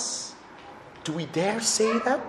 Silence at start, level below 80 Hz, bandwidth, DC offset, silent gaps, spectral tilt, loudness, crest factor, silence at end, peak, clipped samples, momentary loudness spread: 0 s; -66 dBFS; 14 kHz; under 0.1%; none; -3 dB/octave; -26 LUFS; 18 dB; 0 s; -10 dBFS; under 0.1%; 22 LU